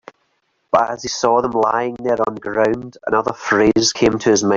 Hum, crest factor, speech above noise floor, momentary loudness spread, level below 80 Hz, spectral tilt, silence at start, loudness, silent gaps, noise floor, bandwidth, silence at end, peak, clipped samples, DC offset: none; 16 dB; 49 dB; 6 LU; -48 dBFS; -4 dB/octave; 0.75 s; -17 LUFS; none; -66 dBFS; 7.6 kHz; 0 s; 0 dBFS; under 0.1%; under 0.1%